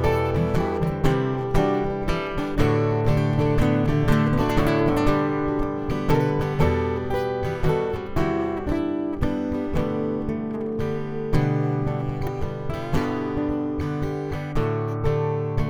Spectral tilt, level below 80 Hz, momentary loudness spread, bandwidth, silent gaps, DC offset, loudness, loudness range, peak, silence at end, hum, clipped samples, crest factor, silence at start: -8 dB/octave; -32 dBFS; 6 LU; 17.5 kHz; none; under 0.1%; -24 LUFS; 5 LU; -6 dBFS; 0 s; none; under 0.1%; 16 dB; 0 s